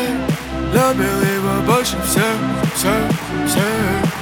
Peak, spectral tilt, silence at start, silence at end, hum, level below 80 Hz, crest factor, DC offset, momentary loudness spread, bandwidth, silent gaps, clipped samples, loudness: -2 dBFS; -4.5 dB/octave; 0 s; 0 s; none; -34 dBFS; 16 dB; under 0.1%; 4 LU; 20 kHz; none; under 0.1%; -17 LUFS